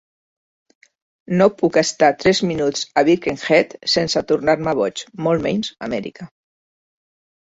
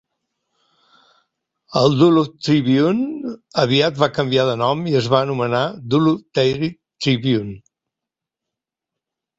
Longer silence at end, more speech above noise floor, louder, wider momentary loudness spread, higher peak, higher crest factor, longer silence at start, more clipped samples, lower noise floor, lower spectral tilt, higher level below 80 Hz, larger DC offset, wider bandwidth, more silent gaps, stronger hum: second, 1.35 s vs 1.8 s; first, over 72 dB vs 68 dB; about the same, -18 LUFS vs -18 LUFS; about the same, 9 LU vs 10 LU; about the same, -2 dBFS vs 0 dBFS; about the same, 18 dB vs 18 dB; second, 1.3 s vs 1.7 s; neither; first, under -90 dBFS vs -85 dBFS; second, -4.5 dB/octave vs -6.5 dB/octave; about the same, -54 dBFS vs -56 dBFS; neither; about the same, 8 kHz vs 8 kHz; neither; neither